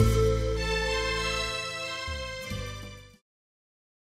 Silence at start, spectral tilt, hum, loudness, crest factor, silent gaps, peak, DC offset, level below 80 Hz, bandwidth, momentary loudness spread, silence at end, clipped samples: 0 s; -4.5 dB/octave; none; -29 LUFS; 20 dB; none; -10 dBFS; under 0.1%; -36 dBFS; 16 kHz; 13 LU; 1 s; under 0.1%